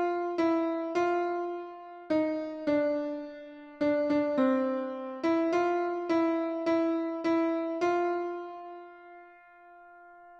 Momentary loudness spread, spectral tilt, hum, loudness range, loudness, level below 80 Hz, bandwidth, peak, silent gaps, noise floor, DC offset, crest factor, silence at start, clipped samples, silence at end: 16 LU; -6 dB/octave; none; 3 LU; -30 LUFS; -72 dBFS; 7.2 kHz; -16 dBFS; none; -54 dBFS; under 0.1%; 14 dB; 0 s; under 0.1%; 0 s